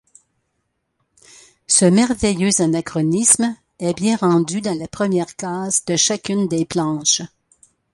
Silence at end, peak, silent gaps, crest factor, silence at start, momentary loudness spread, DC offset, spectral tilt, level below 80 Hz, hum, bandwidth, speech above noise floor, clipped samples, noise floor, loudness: 0.65 s; 0 dBFS; none; 20 dB; 1.7 s; 10 LU; under 0.1%; -4 dB/octave; -50 dBFS; none; 11.5 kHz; 54 dB; under 0.1%; -72 dBFS; -17 LUFS